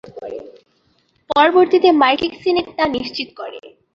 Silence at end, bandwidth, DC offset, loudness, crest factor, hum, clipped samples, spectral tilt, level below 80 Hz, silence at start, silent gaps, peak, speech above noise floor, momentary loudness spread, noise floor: 0.3 s; 6.6 kHz; under 0.1%; -15 LUFS; 16 dB; none; under 0.1%; -5.5 dB/octave; -54 dBFS; 0.15 s; none; -2 dBFS; 44 dB; 20 LU; -61 dBFS